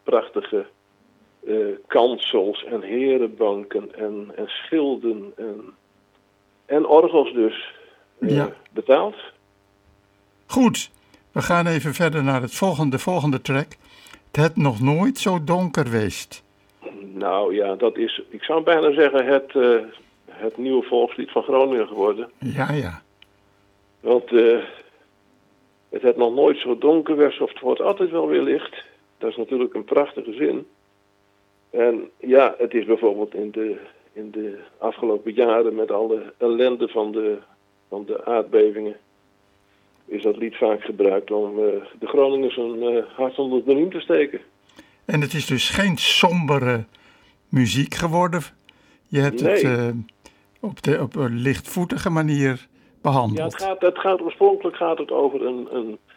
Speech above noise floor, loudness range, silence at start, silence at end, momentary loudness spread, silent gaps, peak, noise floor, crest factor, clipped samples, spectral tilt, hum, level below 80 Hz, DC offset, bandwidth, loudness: 41 dB; 4 LU; 0.05 s; 0.2 s; 13 LU; none; -2 dBFS; -62 dBFS; 20 dB; under 0.1%; -6 dB/octave; none; -58 dBFS; under 0.1%; 17 kHz; -21 LUFS